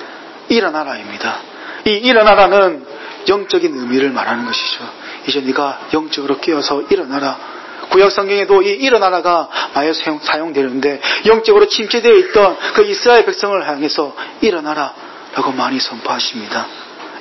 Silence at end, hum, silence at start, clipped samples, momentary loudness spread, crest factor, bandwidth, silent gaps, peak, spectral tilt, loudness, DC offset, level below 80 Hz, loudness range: 0 s; none; 0 s; under 0.1%; 14 LU; 14 dB; 6.2 kHz; none; 0 dBFS; -3.5 dB/octave; -14 LUFS; under 0.1%; -50 dBFS; 6 LU